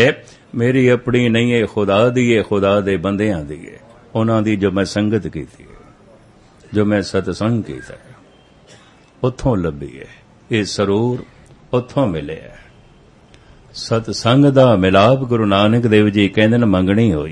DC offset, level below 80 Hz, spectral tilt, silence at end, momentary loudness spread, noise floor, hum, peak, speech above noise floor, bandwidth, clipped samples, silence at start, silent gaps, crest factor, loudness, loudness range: under 0.1%; -44 dBFS; -6.5 dB/octave; 0 s; 17 LU; -47 dBFS; none; 0 dBFS; 32 dB; 11 kHz; under 0.1%; 0 s; none; 16 dB; -16 LUFS; 9 LU